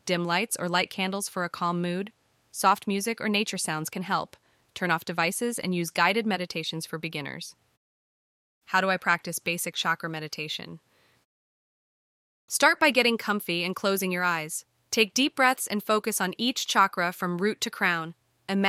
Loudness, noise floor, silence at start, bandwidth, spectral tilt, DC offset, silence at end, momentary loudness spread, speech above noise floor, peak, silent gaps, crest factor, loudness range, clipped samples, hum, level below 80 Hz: -26 LUFS; under -90 dBFS; 0.05 s; 16.5 kHz; -3 dB/octave; under 0.1%; 0 s; 11 LU; over 63 dB; -6 dBFS; 7.77-8.61 s, 11.25-12.48 s; 22 dB; 5 LU; under 0.1%; none; -74 dBFS